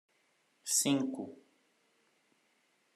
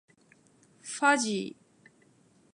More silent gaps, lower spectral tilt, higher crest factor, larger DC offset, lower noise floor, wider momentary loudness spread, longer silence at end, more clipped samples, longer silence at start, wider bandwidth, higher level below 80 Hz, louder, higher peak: neither; about the same, -2.5 dB/octave vs -2.5 dB/octave; about the same, 24 dB vs 24 dB; neither; first, -74 dBFS vs -63 dBFS; about the same, 17 LU vs 18 LU; first, 1.55 s vs 1.05 s; neither; second, 0.65 s vs 0.85 s; first, 13 kHz vs 11.5 kHz; second, under -90 dBFS vs -84 dBFS; second, -31 LUFS vs -28 LUFS; second, -16 dBFS vs -10 dBFS